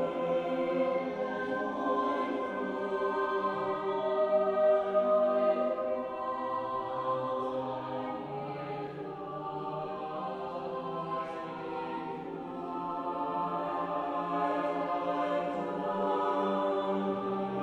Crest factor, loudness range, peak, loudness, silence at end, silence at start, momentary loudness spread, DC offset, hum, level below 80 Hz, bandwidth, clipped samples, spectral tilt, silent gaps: 16 dB; 8 LU; -16 dBFS; -33 LUFS; 0 s; 0 s; 10 LU; under 0.1%; none; -70 dBFS; 8.2 kHz; under 0.1%; -7.5 dB/octave; none